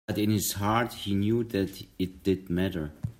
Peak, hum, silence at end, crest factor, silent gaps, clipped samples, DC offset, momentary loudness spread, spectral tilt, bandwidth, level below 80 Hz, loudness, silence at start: -12 dBFS; none; 0.05 s; 18 dB; none; under 0.1%; under 0.1%; 8 LU; -5.5 dB/octave; 16 kHz; -54 dBFS; -29 LUFS; 0.1 s